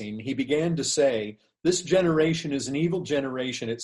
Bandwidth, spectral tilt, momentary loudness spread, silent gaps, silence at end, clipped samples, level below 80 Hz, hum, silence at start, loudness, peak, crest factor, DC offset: 11.5 kHz; -4.5 dB/octave; 8 LU; none; 0 s; under 0.1%; -60 dBFS; none; 0 s; -25 LUFS; -10 dBFS; 16 dB; under 0.1%